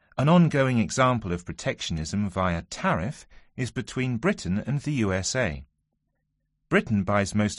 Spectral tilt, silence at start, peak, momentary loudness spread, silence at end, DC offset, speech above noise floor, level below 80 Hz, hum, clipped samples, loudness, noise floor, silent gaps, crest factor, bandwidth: -5.5 dB/octave; 0.15 s; -8 dBFS; 11 LU; 0 s; under 0.1%; 51 dB; -48 dBFS; none; under 0.1%; -26 LUFS; -76 dBFS; none; 18 dB; 11.5 kHz